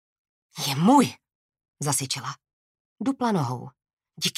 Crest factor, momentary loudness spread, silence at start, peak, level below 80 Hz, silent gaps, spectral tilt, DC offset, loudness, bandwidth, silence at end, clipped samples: 20 dB; 18 LU; 0.55 s; -6 dBFS; -70 dBFS; 1.35-1.49 s, 1.68-1.73 s, 2.53-2.96 s, 3.93-3.97 s; -4.5 dB/octave; under 0.1%; -24 LUFS; 16 kHz; 0.05 s; under 0.1%